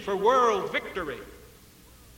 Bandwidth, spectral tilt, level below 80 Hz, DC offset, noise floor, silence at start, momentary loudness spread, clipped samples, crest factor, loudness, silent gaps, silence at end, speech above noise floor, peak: 17 kHz; -4 dB/octave; -56 dBFS; under 0.1%; -53 dBFS; 0 s; 19 LU; under 0.1%; 18 dB; -26 LUFS; none; 0.7 s; 27 dB; -10 dBFS